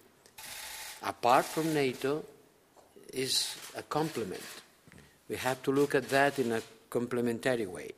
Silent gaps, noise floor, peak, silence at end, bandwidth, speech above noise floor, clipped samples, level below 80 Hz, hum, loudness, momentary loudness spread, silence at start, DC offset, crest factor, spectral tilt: none; -62 dBFS; -10 dBFS; 0.05 s; 15.5 kHz; 31 dB; under 0.1%; -72 dBFS; none; -32 LUFS; 15 LU; 0.4 s; under 0.1%; 22 dB; -4 dB/octave